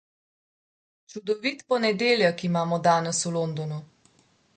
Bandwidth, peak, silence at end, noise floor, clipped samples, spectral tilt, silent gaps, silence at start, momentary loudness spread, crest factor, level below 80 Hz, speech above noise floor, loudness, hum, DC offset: 9.4 kHz; -8 dBFS; 0.7 s; -63 dBFS; under 0.1%; -4.5 dB/octave; none; 1.1 s; 13 LU; 18 dB; -72 dBFS; 38 dB; -25 LUFS; none; under 0.1%